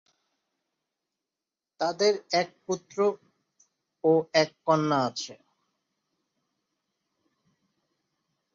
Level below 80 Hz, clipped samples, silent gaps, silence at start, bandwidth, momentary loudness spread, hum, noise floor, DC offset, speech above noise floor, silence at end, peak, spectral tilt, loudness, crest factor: -80 dBFS; under 0.1%; none; 1.8 s; 7.6 kHz; 11 LU; none; -90 dBFS; under 0.1%; 64 dB; 3.2 s; -8 dBFS; -4.5 dB/octave; -27 LUFS; 24 dB